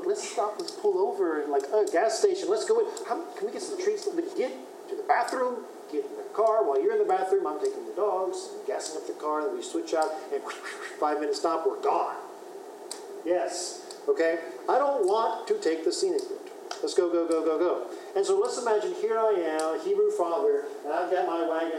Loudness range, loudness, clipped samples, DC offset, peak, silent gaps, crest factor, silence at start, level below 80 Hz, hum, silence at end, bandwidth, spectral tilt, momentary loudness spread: 4 LU; -28 LUFS; under 0.1%; under 0.1%; -10 dBFS; none; 18 dB; 0 s; under -90 dBFS; none; 0 s; 14.5 kHz; -2.5 dB/octave; 10 LU